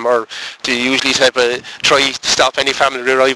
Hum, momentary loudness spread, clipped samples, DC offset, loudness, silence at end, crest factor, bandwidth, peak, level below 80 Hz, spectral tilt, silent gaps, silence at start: none; 6 LU; under 0.1%; under 0.1%; -13 LUFS; 0 s; 14 dB; 11 kHz; -2 dBFS; -50 dBFS; -1.5 dB/octave; none; 0 s